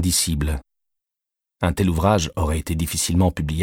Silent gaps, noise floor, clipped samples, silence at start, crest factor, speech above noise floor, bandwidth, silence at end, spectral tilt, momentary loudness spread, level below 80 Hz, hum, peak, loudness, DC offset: none; -86 dBFS; under 0.1%; 0 s; 18 dB; 66 dB; 17 kHz; 0 s; -4.5 dB/octave; 6 LU; -32 dBFS; none; -4 dBFS; -21 LUFS; under 0.1%